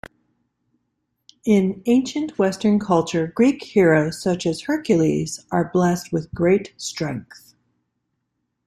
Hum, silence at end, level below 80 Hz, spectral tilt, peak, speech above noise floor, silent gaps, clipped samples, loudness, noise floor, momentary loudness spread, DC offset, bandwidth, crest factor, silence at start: none; 1.45 s; -56 dBFS; -6 dB/octave; -4 dBFS; 56 dB; none; under 0.1%; -20 LUFS; -75 dBFS; 9 LU; under 0.1%; 14 kHz; 16 dB; 1.45 s